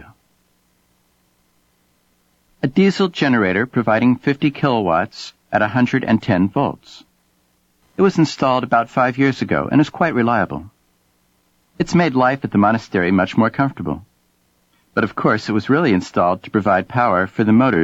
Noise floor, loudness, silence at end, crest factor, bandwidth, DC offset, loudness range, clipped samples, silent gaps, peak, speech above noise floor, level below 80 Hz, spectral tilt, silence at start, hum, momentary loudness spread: -62 dBFS; -17 LUFS; 0 s; 16 dB; 8 kHz; under 0.1%; 2 LU; under 0.1%; none; -2 dBFS; 45 dB; -52 dBFS; -7 dB/octave; 2.65 s; none; 7 LU